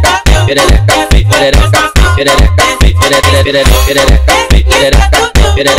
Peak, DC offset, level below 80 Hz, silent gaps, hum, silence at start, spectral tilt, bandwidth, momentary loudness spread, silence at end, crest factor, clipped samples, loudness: 0 dBFS; under 0.1%; -10 dBFS; none; none; 0 s; -4 dB/octave; 16.5 kHz; 1 LU; 0 s; 6 dB; 0.5%; -7 LUFS